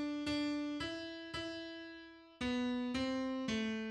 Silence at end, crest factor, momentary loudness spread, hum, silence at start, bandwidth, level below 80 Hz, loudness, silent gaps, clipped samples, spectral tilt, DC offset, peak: 0 s; 14 dB; 11 LU; none; 0 s; 11 kHz; -64 dBFS; -40 LUFS; none; under 0.1%; -4.5 dB/octave; under 0.1%; -26 dBFS